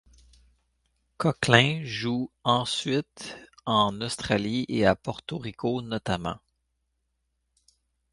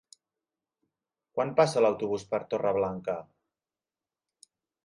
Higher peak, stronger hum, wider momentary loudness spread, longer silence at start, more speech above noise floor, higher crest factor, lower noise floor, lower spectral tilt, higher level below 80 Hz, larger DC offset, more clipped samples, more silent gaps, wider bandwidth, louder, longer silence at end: first, -2 dBFS vs -10 dBFS; neither; first, 16 LU vs 12 LU; second, 1.2 s vs 1.35 s; second, 51 dB vs over 62 dB; first, 28 dB vs 22 dB; second, -77 dBFS vs under -90 dBFS; about the same, -5 dB/octave vs -5.5 dB/octave; first, -54 dBFS vs -68 dBFS; neither; neither; neither; about the same, 11.5 kHz vs 11.5 kHz; first, -26 LUFS vs -29 LUFS; about the same, 1.75 s vs 1.65 s